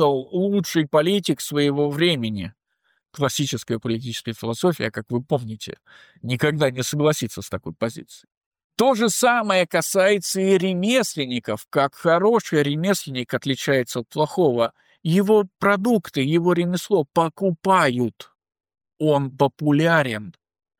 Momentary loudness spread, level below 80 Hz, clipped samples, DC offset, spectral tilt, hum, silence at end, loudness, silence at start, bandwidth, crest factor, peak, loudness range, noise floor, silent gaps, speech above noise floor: 10 LU; -62 dBFS; under 0.1%; under 0.1%; -5 dB/octave; none; 0.5 s; -21 LUFS; 0 s; 19.5 kHz; 16 dB; -6 dBFS; 5 LU; -70 dBFS; 8.37-8.51 s, 8.64-8.70 s; 49 dB